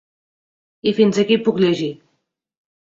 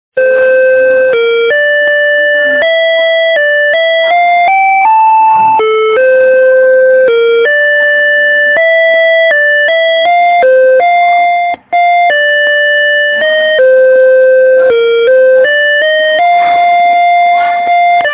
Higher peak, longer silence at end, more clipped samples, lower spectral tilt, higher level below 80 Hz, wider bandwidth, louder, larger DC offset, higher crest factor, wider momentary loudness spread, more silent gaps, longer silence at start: about the same, -2 dBFS vs 0 dBFS; first, 1.05 s vs 0 s; neither; first, -6 dB/octave vs -4.5 dB/octave; second, -62 dBFS vs -56 dBFS; first, 7.8 kHz vs 4 kHz; second, -18 LUFS vs -7 LUFS; neither; first, 18 dB vs 6 dB; first, 8 LU vs 2 LU; neither; first, 0.85 s vs 0.15 s